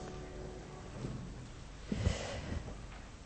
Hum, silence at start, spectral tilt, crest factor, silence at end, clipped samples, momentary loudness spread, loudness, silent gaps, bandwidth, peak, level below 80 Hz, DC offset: none; 0 s; -5.5 dB/octave; 22 dB; 0 s; under 0.1%; 13 LU; -43 LUFS; none; 8.4 kHz; -20 dBFS; -48 dBFS; under 0.1%